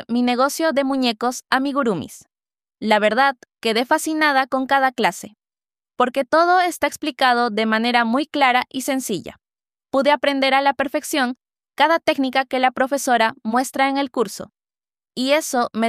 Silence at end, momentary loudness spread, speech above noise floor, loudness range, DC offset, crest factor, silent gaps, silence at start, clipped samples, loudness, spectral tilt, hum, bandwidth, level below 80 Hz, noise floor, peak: 0 s; 8 LU; over 71 dB; 2 LU; under 0.1%; 18 dB; none; 0 s; under 0.1%; -19 LUFS; -3 dB/octave; none; 15.5 kHz; -64 dBFS; under -90 dBFS; -2 dBFS